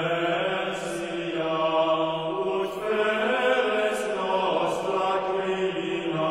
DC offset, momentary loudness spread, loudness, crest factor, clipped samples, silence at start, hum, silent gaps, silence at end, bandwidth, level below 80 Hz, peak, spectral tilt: under 0.1%; 6 LU; -26 LUFS; 14 dB; under 0.1%; 0 s; none; none; 0 s; 14.5 kHz; -62 dBFS; -10 dBFS; -4.5 dB/octave